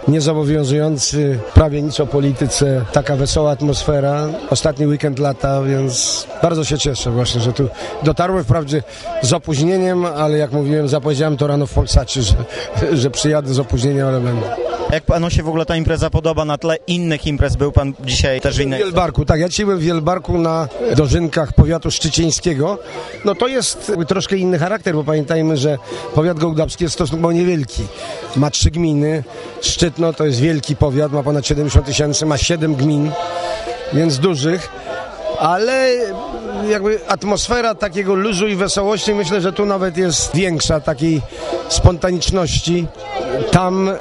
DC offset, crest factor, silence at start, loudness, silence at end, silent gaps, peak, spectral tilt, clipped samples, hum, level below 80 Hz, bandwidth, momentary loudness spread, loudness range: under 0.1%; 16 dB; 0 s; -16 LUFS; 0 s; none; 0 dBFS; -5 dB/octave; under 0.1%; none; -28 dBFS; 11.5 kHz; 5 LU; 2 LU